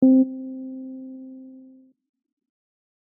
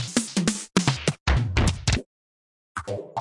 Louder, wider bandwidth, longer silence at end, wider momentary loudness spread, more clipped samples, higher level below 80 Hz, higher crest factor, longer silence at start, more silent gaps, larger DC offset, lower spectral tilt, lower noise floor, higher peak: about the same, -24 LUFS vs -25 LUFS; second, 0.9 kHz vs 11.5 kHz; first, 1.9 s vs 0 s; first, 24 LU vs 10 LU; neither; second, -78 dBFS vs -32 dBFS; about the same, 18 dB vs 20 dB; about the same, 0 s vs 0 s; second, none vs 1.20-1.26 s, 2.06-2.75 s; neither; about the same, -5 dB/octave vs -4.5 dB/octave; second, -51 dBFS vs under -90 dBFS; about the same, -8 dBFS vs -6 dBFS